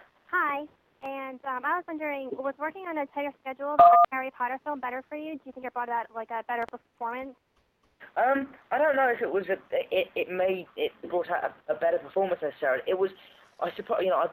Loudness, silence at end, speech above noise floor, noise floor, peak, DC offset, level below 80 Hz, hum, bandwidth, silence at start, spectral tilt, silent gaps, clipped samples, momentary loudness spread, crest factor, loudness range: -28 LUFS; 0 s; 41 dB; -69 dBFS; -6 dBFS; under 0.1%; -72 dBFS; none; 17.5 kHz; 0.3 s; -7 dB/octave; none; under 0.1%; 12 LU; 22 dB; 8 LU